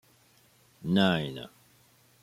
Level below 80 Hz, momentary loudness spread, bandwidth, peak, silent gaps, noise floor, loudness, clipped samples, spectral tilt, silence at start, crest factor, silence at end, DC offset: -66 dBFS; 19 LU; 14.5 kHz; -10 dBFS; none; -63 dBFS; -28 LUFS; under 0.1%; -6.5 dB/octave; 0.8 s; 22 dB; 0.75 s; under 0.1%